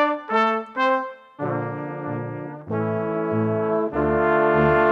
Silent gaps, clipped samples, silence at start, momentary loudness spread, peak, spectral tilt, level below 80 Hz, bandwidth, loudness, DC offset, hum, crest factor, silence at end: none; under 0.1%; 0 s; 12 LU; -6 dBFS; -8.5 dB/octave; -46 dBFS; 7 kHz; -23 LUFS; under 0.1%; none; 16 dB; 0 s